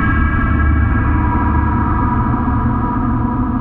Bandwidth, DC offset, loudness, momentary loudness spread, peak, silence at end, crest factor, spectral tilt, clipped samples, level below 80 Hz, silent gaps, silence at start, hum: 3.6 kHz; under 0.1%; -16 LUFS; 3 LU; -2 dBFS; 0 s; 12 dB; -11.5 dB/octave; under 0.1%; -20 dBFS; none; 0 s; none